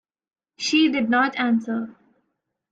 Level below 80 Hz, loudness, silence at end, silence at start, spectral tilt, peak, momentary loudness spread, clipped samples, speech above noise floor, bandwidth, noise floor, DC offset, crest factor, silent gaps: -70 dBFS; -21 LUFS; 0.8 s; 0.6 s; -3.5 dB/octave; -8 dBFS; 10 LU; under 0.1%; 56 dB; 9 kHz; -77 dBFS; under 0.1%; 16 dB; none